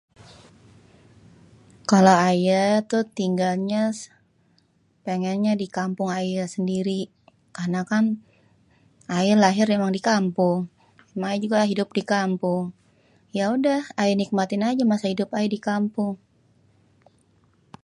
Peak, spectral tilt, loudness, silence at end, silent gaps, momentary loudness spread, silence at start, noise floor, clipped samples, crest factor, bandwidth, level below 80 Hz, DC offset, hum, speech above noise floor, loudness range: -2 dBFS; -6 dB/octave; -23 LUFS; 1.7 s; none; 13 LU; 1.9 s; -63 dBFS; under 0.1%; 22 dB; 11.5 kHz; -68 dBFS; under 0.1%; none; 42 dB; 6 LU